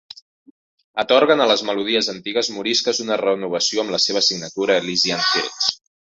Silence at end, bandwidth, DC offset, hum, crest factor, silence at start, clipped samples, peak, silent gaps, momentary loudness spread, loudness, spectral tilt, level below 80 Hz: 0.35 s; 8 kHz; under 0.1%; none; 20 dB; 0.95 s; under 0.1%; -2 dBFS; none; 7 LU; -18 LUFS; -2 dB/octave; -64 dBFS